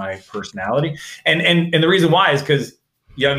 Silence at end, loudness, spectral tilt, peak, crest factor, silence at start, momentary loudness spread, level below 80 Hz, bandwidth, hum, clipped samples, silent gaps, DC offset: 0 s; -16 LUFS; -5.5 dB/octave; -2 dBFS; 16 dB; 0 s; 14 LU; -54 dBFS; 15.5 kHz; none; under 0.1%; none; under 0.1%